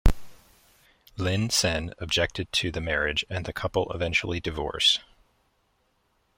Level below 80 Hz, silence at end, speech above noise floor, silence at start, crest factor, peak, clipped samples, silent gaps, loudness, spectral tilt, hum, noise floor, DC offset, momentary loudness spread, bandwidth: -36 dBFS; 1.35 s; 43 dB; 0.05 s; 22 dB; -4 dBFS; under 0.1%; none; -26 LUFS; -3.5 dB/octave; none; -70 dBFS; under 0.1%; 10 LU; 16.5 kHz